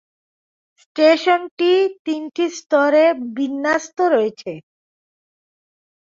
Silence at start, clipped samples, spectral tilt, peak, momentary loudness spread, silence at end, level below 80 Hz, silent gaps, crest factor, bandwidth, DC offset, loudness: 0.95 s; under 0.1%; -3.5 dB/octave; -2 dBFS; 12 LU; 1.45 s; -70 dBFS; 1.51-1.57 s, 1.99-2.05 s; 16 dB; 7.6 kHz; under 0.1%; -18 LUFS